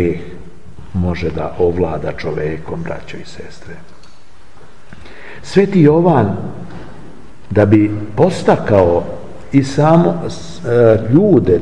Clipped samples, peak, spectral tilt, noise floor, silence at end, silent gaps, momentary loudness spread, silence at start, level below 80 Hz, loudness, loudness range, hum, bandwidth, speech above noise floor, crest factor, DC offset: under 0.1%; 0 dBFS; -8 dB/octave; -45 dBFS; 0 s; none; 22 LU; 0 s; -42 dBFS; -14 LUFS; 11 LU; none; 10.5 kHz; 32 dB; 16 dB; 4%